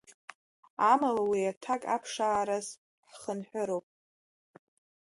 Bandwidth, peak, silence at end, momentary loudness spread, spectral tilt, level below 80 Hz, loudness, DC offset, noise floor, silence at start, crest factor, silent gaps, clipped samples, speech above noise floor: 11.5 kHz; -12 dBFS; 1.25 s; 18 LU; -4 dB/octave; -76 dBFS; -31 LUFS; under 0.1%; under -90 dBFS; 0.8 s; 22 dB; 1.57-1.61 s, 2.78-3.03 s; under 0.1%; over 60 dB